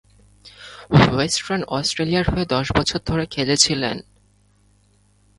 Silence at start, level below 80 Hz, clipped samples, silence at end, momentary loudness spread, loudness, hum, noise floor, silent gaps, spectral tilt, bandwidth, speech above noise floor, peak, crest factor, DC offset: 0.45 s; -40 dBFS; under 0.1%; 1.35 s; 13 LU; -19 LUFS; none; -58 dBFS; none; -4 dB/octave; 11.5 kHz; 39 dB; 0 dBFS; 22 dB; under 0.1%